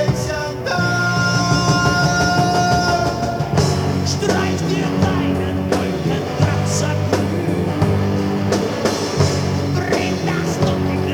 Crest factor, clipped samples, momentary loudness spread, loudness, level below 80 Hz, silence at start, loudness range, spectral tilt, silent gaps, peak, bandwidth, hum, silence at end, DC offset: 14 dB; under 0.1%; 4 LU; -18 LUFS; -38 dBFS; 0 s; 2 LU; -5.5 dB/octave; none; -2 dBFS; 19 kHz; none; 0 s; under 0.1%